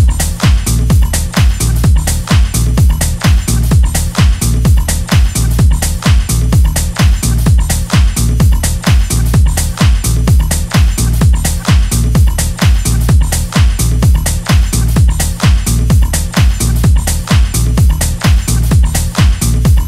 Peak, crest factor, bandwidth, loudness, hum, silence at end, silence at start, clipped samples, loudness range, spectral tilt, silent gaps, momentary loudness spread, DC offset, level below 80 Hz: 0 dBFS; 10 dB; 16 kHz; -11 LUFS; none; 0 s; 0 s; under 0.1%; 0 LU; -5 dB/octave; none; 2 LU; under 0.1%; -12 dBFS